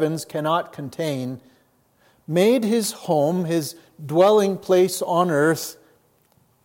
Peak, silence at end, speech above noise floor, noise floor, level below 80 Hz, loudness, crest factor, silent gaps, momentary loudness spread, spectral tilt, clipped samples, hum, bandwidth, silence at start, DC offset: -4 dBFS; 0.9 s; 41 dB; -61 dBFS; -72 dBFS; -21 LUFS; 18 dB; none; 15 LU; -5.5 dB/octave; under 0.1%; none; 16.5 kHz; 0 s; under 0.1%